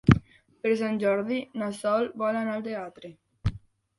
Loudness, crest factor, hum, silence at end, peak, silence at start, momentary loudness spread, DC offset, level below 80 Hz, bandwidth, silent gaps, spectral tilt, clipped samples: -28 LUFS; 24 dB; none; 0.4 s; -2 dBFS; 0.05 s; 11 LU; under 0.1%; -44 dBFS; 11.5 kHz; none; -7.5 dB/octave; under 0.1%